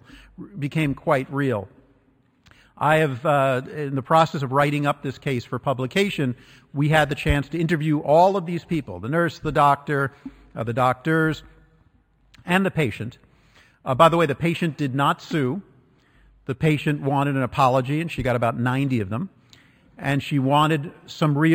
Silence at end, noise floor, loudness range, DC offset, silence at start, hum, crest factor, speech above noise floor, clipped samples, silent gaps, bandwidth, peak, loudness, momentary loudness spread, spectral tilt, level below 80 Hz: 0 s; -61 dBFS; 3 LU; under 0.1%; 0.15 s; none; 20 dB; 39 dB; under 0.1%; none; 15.5 kHz; -2 dBFS; -22 LUFS; 12 LU; -7 dB/octave; -46 dBFS